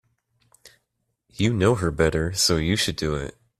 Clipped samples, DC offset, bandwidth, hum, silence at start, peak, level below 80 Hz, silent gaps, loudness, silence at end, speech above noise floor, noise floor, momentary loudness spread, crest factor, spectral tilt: under 0.1%; under 0.1%; 14 kHz; none; 0.65 s; -6 dBFS; -42 dBFS; none; -22 LUFS; 0.3 s; 54 dB; -76 dBFS; 7 LU; 20 dB; -4.5 dB/octave